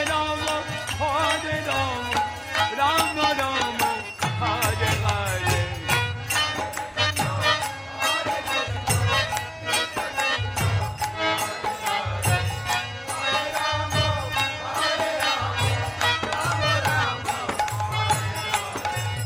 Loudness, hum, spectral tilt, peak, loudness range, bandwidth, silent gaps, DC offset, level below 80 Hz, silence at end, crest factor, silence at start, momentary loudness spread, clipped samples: -24 LUFS; none; -3 dB/octave; -6 dBFS; 2 LU; 16 kHz; none; under 0.1%; -44 dBFS; 0 s; 18 dB; 0 s; 5 LU; under 0.1%